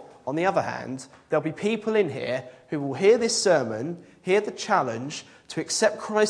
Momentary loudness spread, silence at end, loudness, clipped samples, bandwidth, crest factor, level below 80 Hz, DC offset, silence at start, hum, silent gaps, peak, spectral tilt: 14 LU; 0 s; -25 LUFS; under 0.1%; 10.5 kHz; 18 dB; -70 dBFS; under 0.1%; 0 s; none; none; -6 dBFS; -4 dB/octave